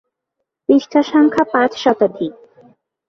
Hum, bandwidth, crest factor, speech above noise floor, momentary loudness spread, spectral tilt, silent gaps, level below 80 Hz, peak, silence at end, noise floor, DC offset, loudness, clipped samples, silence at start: none; 7 kHz; 16 dB; 63 dB; 13 LU; -5.5 dB/octave; none; -60 dBFS; -2 dBFS; 0.8 s; -77 dBFS; under 0.1%; -15 LUFS; under 0.1%; 0.7 s